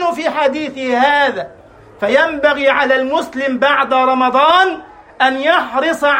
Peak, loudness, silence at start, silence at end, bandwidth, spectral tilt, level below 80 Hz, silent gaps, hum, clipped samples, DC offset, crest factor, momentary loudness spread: 0 dBFS; -14 LUFS; 0 s; 0 s; 16 kHz; -3.5 dB/octave; -54 dBFS; none; none; under 0.1%; under 0.1%; 14 dB; 7 LU